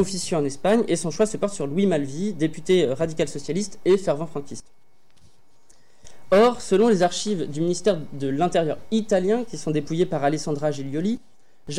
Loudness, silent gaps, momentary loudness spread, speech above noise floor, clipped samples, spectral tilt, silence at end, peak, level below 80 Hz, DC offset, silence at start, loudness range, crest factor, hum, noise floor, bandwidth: -23 LUFS; none; 9 LU; 37 dB; under 0.1%; -5.5 dB/octave; 0 s; -10 dBFS; -54 dBFS; 2%; 0 s; 4 LU; 14 dB; none; -60 dBFS; 13 kHz